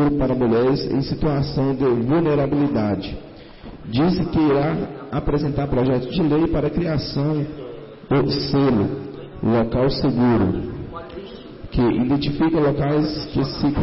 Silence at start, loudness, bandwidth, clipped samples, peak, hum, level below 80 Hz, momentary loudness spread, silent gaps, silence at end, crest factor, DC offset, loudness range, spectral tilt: 0 s; -20 LUFS; 5.8 kHz; under 0.1%; -10 dBFS; none; -36 dBFS; 15 LU; none; 0 s; 10 dB; under 0.1%; 2 LU; -11 dB/octave